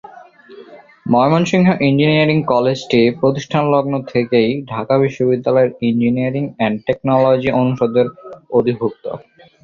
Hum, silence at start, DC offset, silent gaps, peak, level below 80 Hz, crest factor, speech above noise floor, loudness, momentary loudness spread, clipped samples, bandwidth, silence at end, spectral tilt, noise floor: none; 0.15 s; under 0.1%; none; 0 dBFS; -52 dBFS; 14 dB; 25 dB; -15 LUFS; 7 LU; under 0.1%; 7.4 kHz; 0.45 s; -7 dB/octave; -40 dBFS